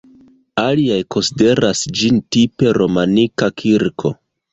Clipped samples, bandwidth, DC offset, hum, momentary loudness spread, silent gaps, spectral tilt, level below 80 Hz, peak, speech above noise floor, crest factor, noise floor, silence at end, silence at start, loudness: under 0.1%; 8.4 kHz; under 0.1%; none; 6 LU; none; -5 dB/octave; -48 dBFS; -2 dBFS; 33 dB; 14 dB; -48 dBFS; 0.4 s; 0.55 s; -15 LUFS